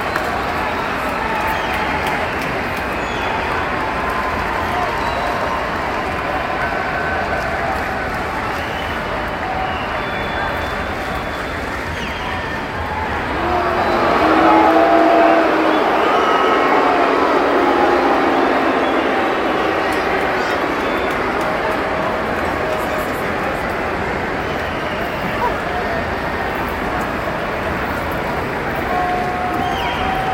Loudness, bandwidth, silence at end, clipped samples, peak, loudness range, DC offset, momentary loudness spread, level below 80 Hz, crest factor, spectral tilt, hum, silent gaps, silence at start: -18 LUFS; 17 kHz; 0 s; under 0.1%; 0 dBFS; 7 LU; under 0.1%; 7 LU; -36 dBFS; 18 dB; -5.5 dB/octave; none; none; 0 s